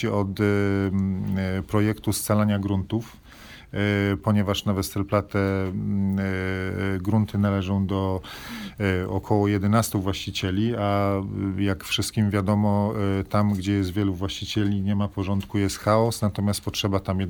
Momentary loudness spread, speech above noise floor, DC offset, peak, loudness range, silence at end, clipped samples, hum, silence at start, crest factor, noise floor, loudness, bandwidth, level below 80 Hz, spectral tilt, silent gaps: 5 LU; 22 dB; under 0.1%; -6 dBFS; 1 LU; 0 s; under 0.1%; none; 0 s; 18 dB; -45 dBFS; -24 LUFS; 20 kHz; -48 dBFS; -6 dB/octave; none